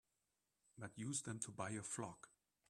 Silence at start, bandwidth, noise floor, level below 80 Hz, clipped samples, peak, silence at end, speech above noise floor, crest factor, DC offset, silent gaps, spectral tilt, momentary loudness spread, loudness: 0.75 s; 13.5 kHz; -89 dBFS; -82 dBFS; under 0.1%; -30 dBFS; 0.4 s; 40 dB; 22 dB; under 0.1%; none; -4 dB/octave; 14 LU; -48 LUFS